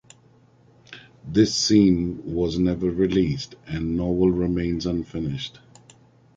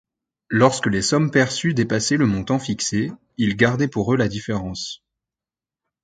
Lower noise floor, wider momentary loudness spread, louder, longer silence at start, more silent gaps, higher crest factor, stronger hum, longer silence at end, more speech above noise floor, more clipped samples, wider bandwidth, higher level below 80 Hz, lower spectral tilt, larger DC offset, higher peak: second, -56 dBFS vs -90 dBFS; first, 13 LU vs 10 LU; second, -23 LUFS vs -20 LUFS; first, 0.9 s vs 0.5 s; neither; about the same, 20 dB vs 20 dB; neither; second, 0.9 s vs 1.1 s; second, 34 dB vs 70 dB; neither; about the same, 9.2 kHz vs 9.6 kHz; first, -42 dBFS vs -48 dBFS; about the same, -6 dB/octave vs -5 dB/octave; neither; second, -4 dBFS vs 0 dBFS